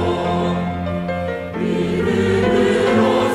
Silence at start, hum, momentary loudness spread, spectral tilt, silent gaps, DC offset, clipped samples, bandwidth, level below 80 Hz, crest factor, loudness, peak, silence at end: 0 s; none; 8 LU; -6.5 dB/octave; none; under 0.1%; under 0.1%; 13 kHz; -44 dBFS; 14 dB; -18 LUFS; -4 dBFS; 0 s